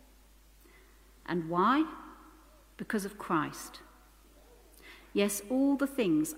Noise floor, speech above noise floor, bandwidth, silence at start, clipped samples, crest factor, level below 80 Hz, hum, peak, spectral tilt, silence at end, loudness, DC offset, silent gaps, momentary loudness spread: -59 dBFS; 29 dB; 16 kHz; 1.3 s; under 0.1%; 20 dB; -60 dBFS; none; -14 dBFS; -5 dB/octave; 0 s; -31 LUFS; under 0.1%; none; 22 LU